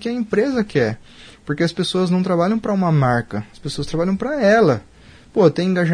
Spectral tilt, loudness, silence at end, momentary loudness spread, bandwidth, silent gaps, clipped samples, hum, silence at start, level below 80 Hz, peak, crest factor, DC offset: -7 dB/octave; -19 LUFS; 0 s; 13 LU; 10.5 kHz; none; under 0.1%; none; 0 s; -46 dBFS; -2 dBFS; 16 dB; under 0.1%